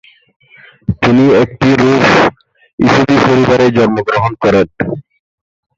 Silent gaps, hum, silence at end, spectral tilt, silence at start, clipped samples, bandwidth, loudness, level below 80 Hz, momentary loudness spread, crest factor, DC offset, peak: 2.73-2.78 s; none; 0.8 s; -6.5 dB/octave; 0.9 s; under 0.1%; 7.8 kHz; -10 LUFS; -38 dBFS; 11 LU; 12 dB; under 0.1%; 0 dBFS